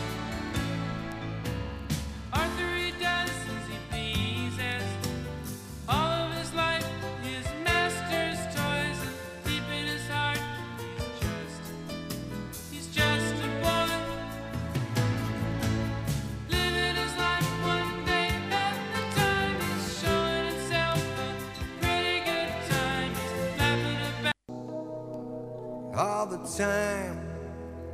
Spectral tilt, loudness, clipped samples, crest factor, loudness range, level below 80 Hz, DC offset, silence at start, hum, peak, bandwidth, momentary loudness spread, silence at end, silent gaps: -4.5 dB/octave; -30 LUFS; under 0.1%; 18 dB; 4 LU; -44 dBFS; under 0.1%; 0 s; none; -12 dBFS; 15.5 kHz; 11 LU; 0 s; none